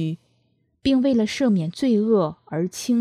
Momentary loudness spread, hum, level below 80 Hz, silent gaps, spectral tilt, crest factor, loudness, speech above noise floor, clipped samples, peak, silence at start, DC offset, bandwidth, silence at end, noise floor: 9 LU; none; -56 dBFS; none; -6 dB/octave; 14 dB; -22 LUFS; 46 dB; under 0.1%; -8 dBFS; 0 s; under 0.1%; 14 kHz; 0 s; -66 dBFS